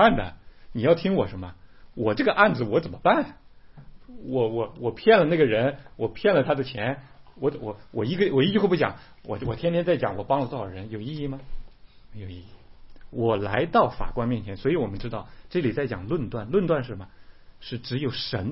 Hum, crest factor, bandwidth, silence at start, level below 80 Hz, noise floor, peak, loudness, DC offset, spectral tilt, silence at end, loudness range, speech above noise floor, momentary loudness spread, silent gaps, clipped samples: none; 22 dB; 5.8 kHz; 0 s; -44 dBFS; -47 dBFS; -2 dBFS; -25 LUFS; 0.3%; -10.5 dB/octave; 0 s; 5 LU; 23 dB; 17 LU; none; under 0.1%